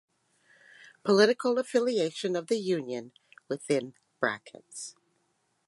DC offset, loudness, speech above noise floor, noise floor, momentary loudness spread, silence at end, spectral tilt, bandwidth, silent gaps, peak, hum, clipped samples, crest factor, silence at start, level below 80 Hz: under 0.1%; -29 LUFS; 46 dB; -74 dBFS; 18 LU; 0.75 s; -4.5 dB/octave; 11.5 kHz; none; -10 dBFS; none; under 0.1%; 22 dB; 1.05 s; -82 dBFS